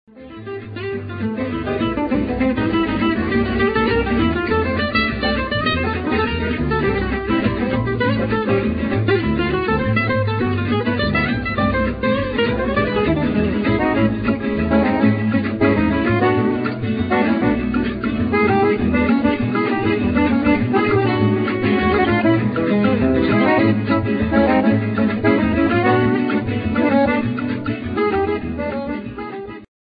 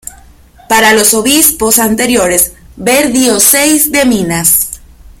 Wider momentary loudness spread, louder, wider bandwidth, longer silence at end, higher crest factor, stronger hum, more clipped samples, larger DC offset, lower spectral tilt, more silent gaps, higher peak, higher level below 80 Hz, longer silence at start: about the same, 7 LU vs 6 LU; second, -18 LUFS vs -7 LUFS; second, 5 kHz vs over 20 kHz; second, 0.25 s vs 0.4 s; first, 16 dB vs 10 dB; neither; second, under 0.1% vs 0.7%; neither; first, -12 dB/octave vs -2 dB/octave; neither; about the same, -2 dBFS vs 0 dBFS; about the same, -34 dBFS vs -36 dBFS; second, 0.15 s vs 0.7 s